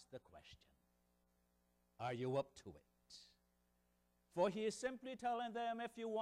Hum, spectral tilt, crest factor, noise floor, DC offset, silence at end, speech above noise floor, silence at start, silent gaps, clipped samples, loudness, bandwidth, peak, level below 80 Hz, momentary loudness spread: 60 Hz at -80 dBFS; -5 dB/octave; 20 dB; -81 dBFS; under 0.1%; 0 s; 37 dB; 0 s; none; under 0.1%; -44 LUFS; 15 kHz; -26 dBFS; -80 dBFS; 21 LU